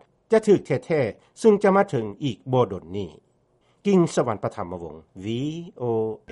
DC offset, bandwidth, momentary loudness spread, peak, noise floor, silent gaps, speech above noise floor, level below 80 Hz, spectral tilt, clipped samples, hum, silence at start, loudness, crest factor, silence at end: under 0.1%; 11 kHz; 15 LU; -4 dBFS; -64 dBFS; none; 41 dB; -60 dBFS; -7 dB/octave; under 0.1%; none; 0.3 s; -23 LUFS; 18 dB; 0 s